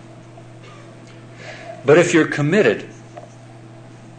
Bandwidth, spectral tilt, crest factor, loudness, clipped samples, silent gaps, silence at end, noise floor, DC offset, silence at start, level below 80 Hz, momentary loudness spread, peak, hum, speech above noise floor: 9.4 kHz; -5.5 dB/octave; 18 dB; -16 LUFS; under 0.1%; none; 0.95 s; -40 dBFS; under 0.1%; 0.35 s; -60 dBFS; 27 LU; -2 dBFS; none; 25 dB